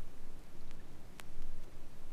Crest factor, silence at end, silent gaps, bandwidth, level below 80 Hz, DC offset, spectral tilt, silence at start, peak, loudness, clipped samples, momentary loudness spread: 10 dB; 0 s; none; 4.5 kHz; -42 dBFS; under 0.1%; -5 dB/octave; 0 s; -24 dBFS; -55 LUFS; under 0.1%; 4 LU